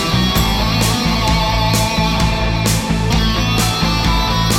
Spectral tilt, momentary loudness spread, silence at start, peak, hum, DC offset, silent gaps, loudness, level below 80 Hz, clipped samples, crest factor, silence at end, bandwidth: -4.5 dB/octave; 1 LU; 0 s; -2 dBFS; none; under 0.1%; none; -15 LUFS; -22 dBFS; under 0.1%; 14 dB; 0 s; 17.5 kHz